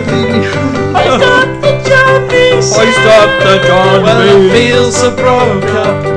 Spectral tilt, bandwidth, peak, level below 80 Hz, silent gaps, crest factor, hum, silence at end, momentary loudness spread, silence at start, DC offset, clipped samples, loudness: -4.5 dB/octave; 11 kHz; 0 dBFS; -34 dBFS; none; 8 dB; none; 0 s; 6 LU; 0 s; under 0.1%; 2%; -7 LUFS